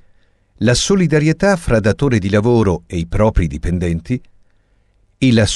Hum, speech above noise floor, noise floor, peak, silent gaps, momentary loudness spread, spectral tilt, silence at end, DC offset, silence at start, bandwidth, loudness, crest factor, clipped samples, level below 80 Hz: none; 42 dB; -56 dBFS; -4 dBFS; none; 8 LU; -5.5 dB/octave; 0 s; under 0.1%; 0.6 s; 12 kHz; -16 LUFS; 12 dB; under 0.1%; -28 dBFS